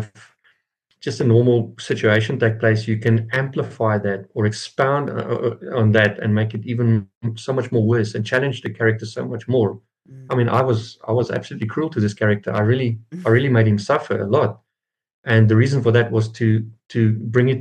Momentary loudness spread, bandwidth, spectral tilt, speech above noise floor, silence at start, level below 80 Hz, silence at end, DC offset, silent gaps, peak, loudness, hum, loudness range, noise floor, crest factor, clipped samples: 9 LU; 9 kHz; -7.5 dB/octave; 64 dB; 0 s; -64 dBFS; 0 s; under 0.1%; 7.15-7.21 s, 15.14-15.23 s; -2 dBFS; -19 LUFS; none; 3 LU; -83 dBFS; 18 dB; under 0.1%